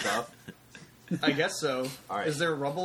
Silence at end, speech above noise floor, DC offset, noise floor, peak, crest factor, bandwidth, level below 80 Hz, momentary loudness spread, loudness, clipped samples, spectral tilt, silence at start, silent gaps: 0 s; 22 dB; under 0.1%; -52 dBFS; -12 dBFS; 20 dB; 19.5 kHz; -68 dBFS; 23 LU; -30 LUFS; under 0.1%; -4 dB/octave; 0 s; none